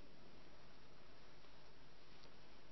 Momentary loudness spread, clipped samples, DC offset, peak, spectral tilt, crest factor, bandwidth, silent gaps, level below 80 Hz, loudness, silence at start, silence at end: 1 LU; under 0.1%; 0.3%; -42 dBFS; -3.5 dB/octave; 18 dB; 6 kHz; none; -74 dBFS; -65 LUFS; 0 s; 0 s